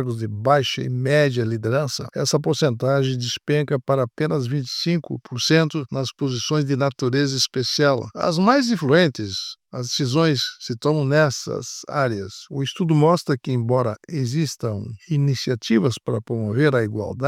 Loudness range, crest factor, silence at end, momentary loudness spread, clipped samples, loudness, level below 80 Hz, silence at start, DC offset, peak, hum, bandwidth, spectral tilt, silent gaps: 2 LU; 18 dB; 0 s; 9 LU; under 0.1%; -21 LUFS; -62 dBFS; 0 s; under 0.1%; -2 dBFS; none; 14.5 kHz; -5.5 dB/octave; none